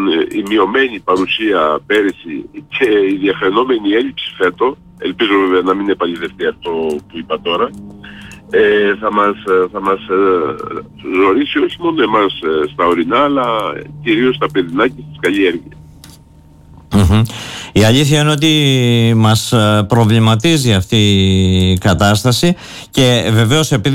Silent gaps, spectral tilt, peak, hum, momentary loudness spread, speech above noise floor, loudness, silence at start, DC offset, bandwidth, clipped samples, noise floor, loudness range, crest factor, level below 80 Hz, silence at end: none; -5.5 dB/octave; -2 dBFS; none; 10 LU; 29 dB; -13 LUFS; 0 s; under 0.1%; 16.5 kHz; under 0.1%; -42 dBFS; 5 LU; 10 dB; -36 dBFS; 0 s